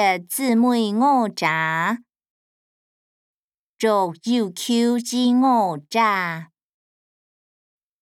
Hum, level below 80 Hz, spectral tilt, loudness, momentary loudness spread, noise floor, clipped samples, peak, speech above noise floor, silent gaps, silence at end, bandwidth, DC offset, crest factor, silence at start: none; -80 dBFS; -4.5 dB/octave; -20 LUFS; 6 LU; under -90 dBFS; under 0.1%; -6 dBFS; over 70 dB; 2.30-3.50 s, 3.58-3.77 s; 1.6 s; 16 kHz; under 0.1%; 16 dB; 0 s